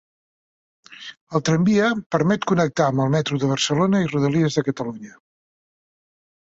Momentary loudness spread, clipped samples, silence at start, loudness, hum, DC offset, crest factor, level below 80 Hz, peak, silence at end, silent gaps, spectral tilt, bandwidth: 13 LU; under 0.1%; 0.9 s; -20 LUFS; none; under 0.1%; 18 dB; -58 dBFS; -6 dBFS; 1.45 s; 1.21-1.27 s, 2.06-2.10 s; -6 dB/octave; 8 kHz